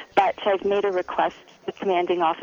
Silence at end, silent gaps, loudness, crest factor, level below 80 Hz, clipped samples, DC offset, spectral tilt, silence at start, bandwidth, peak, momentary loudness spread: 0 s; none; -23 LUFS; 16 dB; -62 dBFS; under 0.1%; under 0.1%; -5.5 dB/octave; 0 s; 7.2 kHz; -8 dBFS; 8 LU